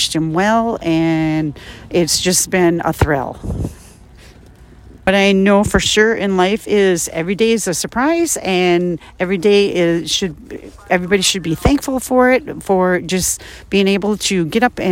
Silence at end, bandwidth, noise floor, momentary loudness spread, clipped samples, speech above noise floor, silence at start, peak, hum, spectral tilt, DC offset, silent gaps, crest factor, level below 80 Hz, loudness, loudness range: 0 s; 16.5 kHz; -41 dBFS; 9 LU; under 0.1%; 26 dB; 0 s; 0 dBFS; none; -4 dB/octave; under 0.1%; none; 16 dB; -36 dBFS; -15 LUFS; 3 LU